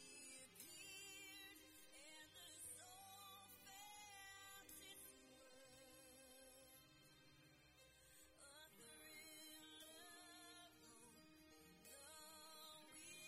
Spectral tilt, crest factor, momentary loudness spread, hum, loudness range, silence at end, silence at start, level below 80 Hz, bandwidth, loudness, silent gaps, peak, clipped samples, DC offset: -1 dB/octave; 22 dB; 11 LU; none; 7 LU; 0 s; 0 s; -86 dBFS; 16 kHz; -61 LUFS; none; -40 dBFS; under 0.1%; under 0.1%